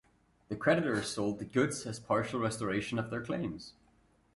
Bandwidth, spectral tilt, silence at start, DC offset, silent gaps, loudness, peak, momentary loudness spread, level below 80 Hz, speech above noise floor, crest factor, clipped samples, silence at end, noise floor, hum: 11.5 kHz; -5 dB/octave; 0.5 s; under 0.1%; none; -33 LUFS; -14 dBFS; 10 LU; -62 dBFS; 35 dB; 20 dB; under 0.1%; 0.65 s; -68 dBFS; none